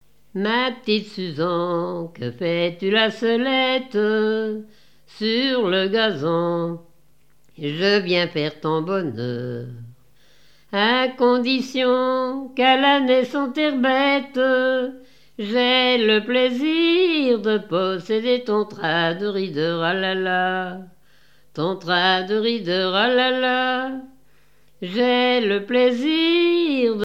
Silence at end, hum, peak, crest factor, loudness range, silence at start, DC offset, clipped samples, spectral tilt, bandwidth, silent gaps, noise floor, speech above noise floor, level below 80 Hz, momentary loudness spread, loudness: 0 s; none; -4 dBFS; 18 dB; 4 LU; 0.35 s; 0.3%; under 0.1%; -6 dB/octave; 8.4 kHz; none; -62 dBFS; 41 dB; -68 dBFS; 10 LU; -20 LUFS